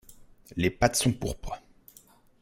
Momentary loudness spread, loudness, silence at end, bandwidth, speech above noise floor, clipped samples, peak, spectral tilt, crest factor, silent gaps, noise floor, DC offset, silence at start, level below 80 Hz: 17 LU; -27 LUFS; 0.85 s; 16.5 kHz; 31 dB; under 0.1%; -6 dBFS; -4.5 dB/octave; 26 dB; none; -58 dBFS; under 0.1%; 0.1 s; -46 dBFS